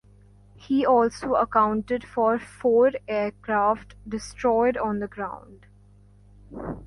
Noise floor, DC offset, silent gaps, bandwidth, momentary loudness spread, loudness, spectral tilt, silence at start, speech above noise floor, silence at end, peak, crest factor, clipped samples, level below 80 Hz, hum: -53 dBFS; under 0.1%; none; 11.5 kHz; 14 LU; -24 LUFS; -6 dB/octave; 0.6 s; 29 dB; 0 s; -8 dBFS; 18 dB; under 0.1%; -52 dBFS; 50 Hz at -50 dBFS